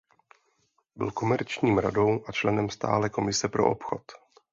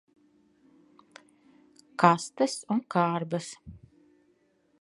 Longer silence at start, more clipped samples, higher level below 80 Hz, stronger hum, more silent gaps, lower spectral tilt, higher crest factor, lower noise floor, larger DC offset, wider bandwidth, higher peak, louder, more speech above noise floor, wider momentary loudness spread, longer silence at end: second, 0.95 s vs 2 s; neither; first, -56 dBFS vs -66 dBFS; neither; neither; about the same, -5 dB/octave vs -5.5 dB/octave; second, 20 dB vs 28 dB; about the same, -71 dBFS vs -68 dBFS; neither; second, 7.8 kHz vs 11.5 kHz; second, -8 dBFS vs -2 dBFS; about the same, -27 LUFS vs -27 LUFS; first, 45 dB vs 41 dB; second, 9 LU vs 20 LU; second, 0.35 s vs 1.05 s